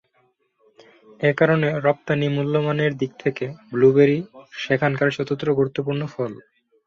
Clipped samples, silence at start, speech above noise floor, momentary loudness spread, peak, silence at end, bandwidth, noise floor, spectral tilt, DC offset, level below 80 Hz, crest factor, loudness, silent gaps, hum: under 0.1%; 1.2 s; 45 dB; 11 LU; -4 dBFS; 0.5 s; 7.2 kHz; -65 dBFS; -7.5 dB/octave; under 0.1%; -62 dBFS; 18 dB; -21 LUFS; none; none